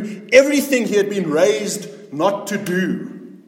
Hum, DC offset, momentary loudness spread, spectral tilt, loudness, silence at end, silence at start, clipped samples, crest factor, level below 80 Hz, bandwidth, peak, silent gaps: none; under 0.1%; 15 LU; -4.5 dB/octave; -18 LUFS; 0.1 s; 0 s; under 0.1%; 18 dB; -66 dBFS; 16.5 kHz; 0 dBFS; none